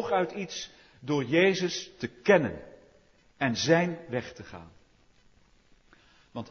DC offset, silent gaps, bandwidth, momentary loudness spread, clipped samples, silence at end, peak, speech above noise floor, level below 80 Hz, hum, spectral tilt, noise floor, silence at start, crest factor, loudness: under 0.1%; none; 6.8 kHz; 21 LU; under 0.1%; 0 s; -8 dBFS; 34 dB; -64 dBFS; none; -5 dB/octave; -62 dBFS; 0 s; 22 dB; -28 LUFS